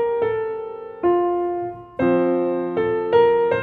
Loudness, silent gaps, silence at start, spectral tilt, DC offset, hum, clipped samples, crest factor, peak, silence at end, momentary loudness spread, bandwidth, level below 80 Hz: -21 LUFS; none; 0 s; -9 dB/octave; under 0.1%; none; under 0.1%; 16 dB; -4 dBFS; 0 s; 11 LU; 4.6 kHz; -56 dBFS